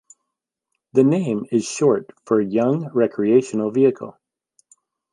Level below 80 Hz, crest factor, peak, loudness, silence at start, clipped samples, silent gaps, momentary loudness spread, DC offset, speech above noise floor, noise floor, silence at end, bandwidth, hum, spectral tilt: -68 dBFS; 18 dB; -4 dBFS; -19 LUFS; 0.95 s; under 0.1%; none; 6 LU; under 0.1%; 63 dB; -82 dBFS; 1 s; 11 kHz; none; -7 dB/octave